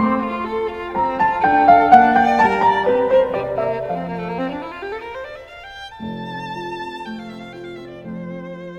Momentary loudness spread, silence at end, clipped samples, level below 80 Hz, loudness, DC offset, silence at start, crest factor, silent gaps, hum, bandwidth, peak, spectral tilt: 22 LU; 0 s; under 0.1%; -48 dBFS; -17 LUFS; under 0.1%; 0 s; 18 dB; none; none; 8.4 kHz; 0 dBFS; -6.5 dB/octave